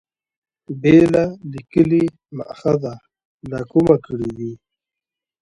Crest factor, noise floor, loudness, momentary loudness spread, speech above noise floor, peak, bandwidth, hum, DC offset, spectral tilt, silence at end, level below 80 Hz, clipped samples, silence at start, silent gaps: 18 dB; -87 dBFS; -17 LUFS; 20 LU; 70 dB; 0 dBFS; 9.2 kHz; none; under 0.1%; -8.5 dB/octave; 0.85 s; -50 dBFS; under 0.1%; 0.7 s; 3.25-3.39 s